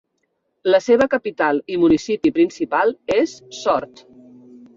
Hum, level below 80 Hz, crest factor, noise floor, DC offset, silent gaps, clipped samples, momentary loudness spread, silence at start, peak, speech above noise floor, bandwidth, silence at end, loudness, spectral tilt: none; -56 dBFS; 16 dB; -71 dBFS; under 0.1%; none; under 0.1%; 8 LU; 0.65 s; -4 dBFS; 53 dB; 7.6 kHz; 0.9 s; -19 LUFS; -5 dB/octave